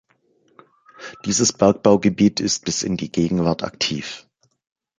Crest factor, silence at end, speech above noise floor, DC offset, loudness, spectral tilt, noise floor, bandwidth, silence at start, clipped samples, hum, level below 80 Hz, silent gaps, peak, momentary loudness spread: 20 dB; 0.8 s; 43 dB; under 0.1%; -19 LUFS; -4.5 dB/octave; -62 dBFS; 9.6 kHz; 1 s; under 0.1%; none; -50 dBFS; none; -2 dBFS; 16 LU